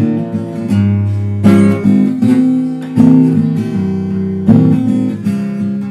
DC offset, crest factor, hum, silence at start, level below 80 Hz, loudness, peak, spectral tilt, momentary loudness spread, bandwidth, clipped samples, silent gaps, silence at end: under 0.1%; 12 dB; none; 0 s; -46 dBFS; -12 LUFS; 0 dBFS; -9 dB/octave; 8 LU; 11.5 kHz; 0.3%; none; 0 s